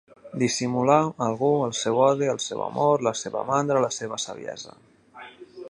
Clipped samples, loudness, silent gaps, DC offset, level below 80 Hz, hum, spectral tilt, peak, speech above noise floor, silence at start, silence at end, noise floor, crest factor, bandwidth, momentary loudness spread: under 0.1%; -24 LUFS; none; under 0.1%; -68 dBFS; none; -4.5 dB/octave; -4 dBFS; 23 dB; 0.25 s; 0.05 s; -46 dBFS; 20 dB; 11.5 kHz; 18 LU